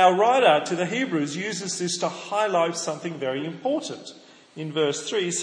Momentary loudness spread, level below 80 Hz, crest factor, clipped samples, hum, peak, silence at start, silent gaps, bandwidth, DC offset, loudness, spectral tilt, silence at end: 13 LU; -80 dBFS; 20 dB; under 0.1%; none; -4 dBFS; 0 s; none; 10.5 kHz; under 0.1%; -24 LUFS; -3.5 dB/octave; 0 s